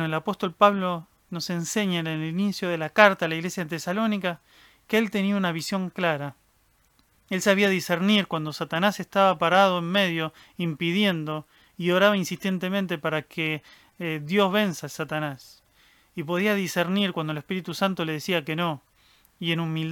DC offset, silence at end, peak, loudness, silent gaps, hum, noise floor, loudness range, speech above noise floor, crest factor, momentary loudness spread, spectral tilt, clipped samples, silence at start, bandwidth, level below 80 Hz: under 0.1%; 0 s; -2 dBFS; -25 LUFS; none; none; -64 dBFS; 5 LU; 40 dB; 24 dB; 11 LU; -5 dB/octave; under 0.1%; 0 s; 18.5 kHz; -68 dBFS